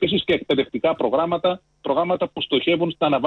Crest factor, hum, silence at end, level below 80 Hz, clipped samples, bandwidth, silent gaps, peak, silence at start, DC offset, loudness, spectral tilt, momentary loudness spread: 14 dB; none; 0 s; -56 dBFS; under 0.1%; 5.8 kHz; none; -8 dBFS; 0 s; under 0.1%; -21 LUFS; -7.5 dB/octave; 4 LU